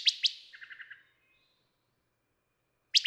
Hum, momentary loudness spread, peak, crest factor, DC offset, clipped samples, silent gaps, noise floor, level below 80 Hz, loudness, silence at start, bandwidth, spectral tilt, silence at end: none; 23 LU; -10 dBFS; 26 dB; under 0.1%; under 0.1%; none; -79 dBFS; under -90 dBFS; -29 LUFS; 0 s; 16 kHz; 5.5 dB/octave; 0 s